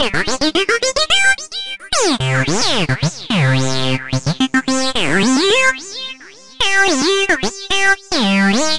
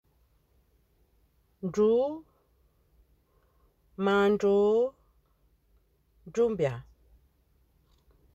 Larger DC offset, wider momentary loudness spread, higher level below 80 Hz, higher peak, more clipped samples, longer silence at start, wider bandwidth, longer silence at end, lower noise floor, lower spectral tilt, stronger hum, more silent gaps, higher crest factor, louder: first, 3% vs under 0.1%; second, 7 LU vs 16 LU; first, -42 dBFS vs -62 dBFS; first, -2 dBFS vs -16 dBFS; neither; second, 0 s vs 1.65 s; first, 11.5 kHz vs 8 kHz; second, 0 s vs 1.55 s; second, -36 dBFS vs -68 dBFS; second, -3.5 dB/octave vs -7 dB/octave; neither; neither; about the same, 14 dB vs 16 dB; first, -15 LUFS vs -27 LUFS